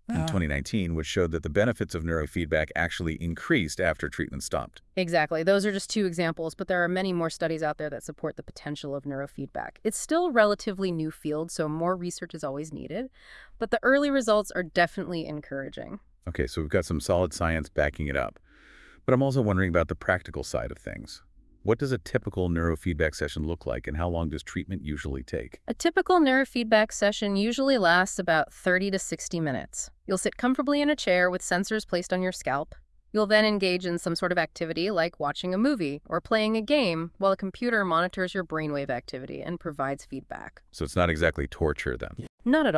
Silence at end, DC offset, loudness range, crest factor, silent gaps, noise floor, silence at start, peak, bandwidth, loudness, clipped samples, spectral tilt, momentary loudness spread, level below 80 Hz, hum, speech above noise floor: 0 s; under 0.1%; 5 LU; 20 dB; 42.29-42.38 s; -54 dBFS; 0.1 s; -6 dBFS; 12 kHz; -27 LUFS; under 0.1%; -5 dB/octave; 13 LU; -46 dBFS; none; 26 dB